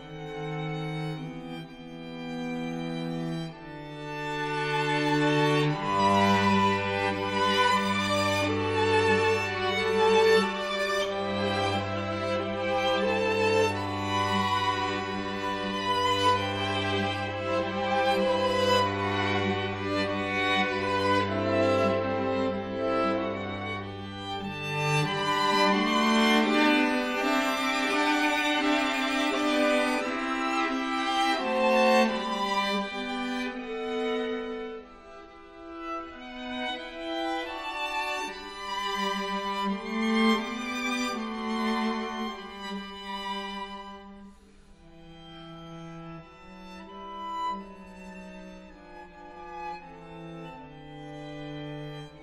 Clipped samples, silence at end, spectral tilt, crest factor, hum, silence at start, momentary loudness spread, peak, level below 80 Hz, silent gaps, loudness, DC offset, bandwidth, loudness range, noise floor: under 0.1%; 0 s; -4.5 dB/octave; 18 dB; none; 0 s; 19 LU; -10 dBFS; -56 dBFS; none; -27 LUFS; under 0.1%; 16 kHz; 15 LU; -53 dBFS